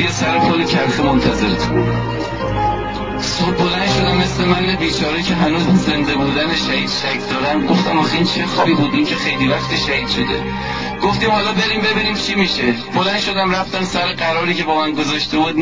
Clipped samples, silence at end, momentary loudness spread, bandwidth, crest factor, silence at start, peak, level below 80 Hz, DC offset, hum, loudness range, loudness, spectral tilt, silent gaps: under 0.1%; 0 s; 4 LU; 7.6 kHz; 14 dB; 0 s; -2 dBFS; -34 dBFS; 0.7%; none; 1 LU; -16 LUFS; -5 dB/octave; none